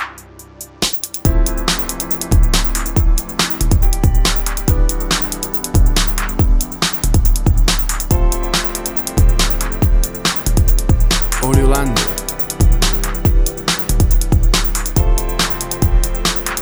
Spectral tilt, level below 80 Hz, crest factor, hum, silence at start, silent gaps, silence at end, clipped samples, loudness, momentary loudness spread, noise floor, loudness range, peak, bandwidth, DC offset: -4 dB/octave; -16 dBFS; 14 dB; none; 0 s; none; 0 s; under 0.1%; -16 LUFS; 3 LU; -37 dBFS; 1 LU; 0 dBFS; over 20 kHz; under 0.1%